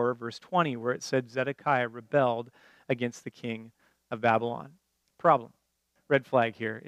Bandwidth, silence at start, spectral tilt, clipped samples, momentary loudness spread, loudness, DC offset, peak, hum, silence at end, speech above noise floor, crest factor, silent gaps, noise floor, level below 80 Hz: 13.5 kHz; 0 s; -6 dB/octave; under 0.1%; 13 LU; -29 LUFS; under 0.1%; -8 dBFS; none; 0 s; 46 dB; 22 dB; none; -75 dBFS; -80 dBFS